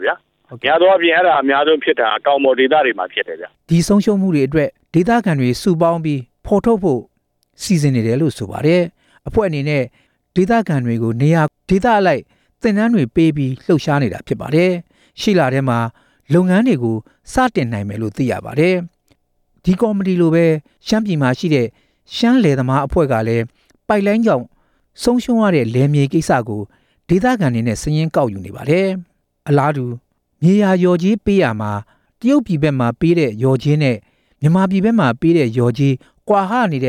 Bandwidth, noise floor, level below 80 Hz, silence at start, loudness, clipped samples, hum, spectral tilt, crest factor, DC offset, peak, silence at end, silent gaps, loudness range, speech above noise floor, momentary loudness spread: 15 kHz; -61 dBFS; -42 dBFS; 0 s; -16 LUFS; under 0.1%; none; -7 dB/octave; 14 dB; under 0.1%; -2 dBFS; 0 s; none; 2 LU; 47 dB; 9 LU